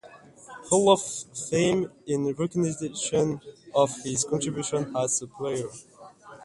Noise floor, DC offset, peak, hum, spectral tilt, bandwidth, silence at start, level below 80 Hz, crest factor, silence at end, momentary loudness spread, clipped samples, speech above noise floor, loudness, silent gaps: -49 dBFS; under 0.1%; -4 dBFS; none; -4.5 dB/octave; 11.5 kHz; 0.05 s; -62 dBFS; 22 dB; 0 s; 11 LU; under 0.1%; 23 dB; -26 LUFS; none